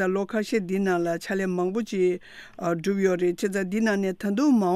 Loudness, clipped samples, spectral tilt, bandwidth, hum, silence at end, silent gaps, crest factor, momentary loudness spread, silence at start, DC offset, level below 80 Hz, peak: -25 LUFS; under 0.1%; -6.5 dB/octave; 15 kHz; none; 0 s; none; 14 dB; 4 LU; 0 s; under 0.1%; -62 dBFS; -10 dBFS